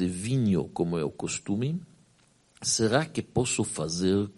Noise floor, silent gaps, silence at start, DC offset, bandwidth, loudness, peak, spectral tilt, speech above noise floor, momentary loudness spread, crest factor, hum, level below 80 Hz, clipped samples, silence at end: -63 dBFS; none; 0 s; under 0.1%; 11.5 kHz; -28 LUFS; -10 dBFS; -4.5 dB/octave; 36 dB; 7 LU; 20 dB; none; -56 dBFS; under 0.1%; 0.05 s